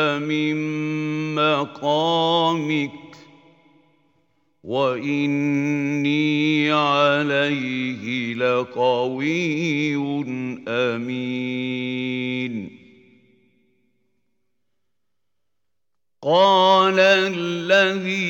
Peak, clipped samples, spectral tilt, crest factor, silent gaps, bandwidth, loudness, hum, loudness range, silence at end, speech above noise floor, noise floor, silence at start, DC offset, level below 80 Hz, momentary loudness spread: -2 dBFS; under 0.1%; -5.5 dB/octave; 20 dB; none; 16.5 kHz; -20 LUFS; none; 9 LU; 0 s; 64 dB; -85 dBFS; 0 s; under 0.1%; -74 dBFS; 10 LU